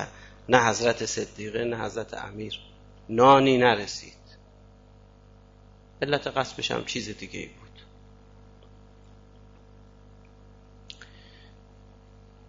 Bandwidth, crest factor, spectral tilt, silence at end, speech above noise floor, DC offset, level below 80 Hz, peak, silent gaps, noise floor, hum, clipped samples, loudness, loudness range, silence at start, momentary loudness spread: 7.8 kHz; 26 dB; -4 dB/octave; 1.55 s; 28 dB; under 0.1%; -54 dBFS; -4 dBFS; none; -53 dBFS; 50 Hz at -50 dBFS; under 0.1%; -25 LUFS; 12 LU; 0 s; 25 LU